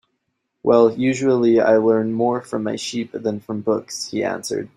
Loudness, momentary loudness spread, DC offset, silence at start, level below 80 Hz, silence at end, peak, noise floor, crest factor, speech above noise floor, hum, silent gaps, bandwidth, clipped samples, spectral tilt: -19 LUFS; 11 LU; under 0.1%; 0.65 s; -62 dBFS; 0.1 s; -2 dBFS; -74 dBFS; 18 dB; 55 dB; none; none; 13.5 kHz; under 0.1%; -5.5 dB/octave